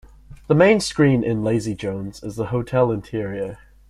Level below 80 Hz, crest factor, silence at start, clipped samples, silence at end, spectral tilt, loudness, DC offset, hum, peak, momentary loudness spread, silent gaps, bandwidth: -46 dBFS; 20 dB; 0.3 s; under 0.1%; 0.35 s; -6.5 dB/octave; -20 LUFS; under 0.1%; none; -2 dBFS; 14 LU; none; 12.5 kHz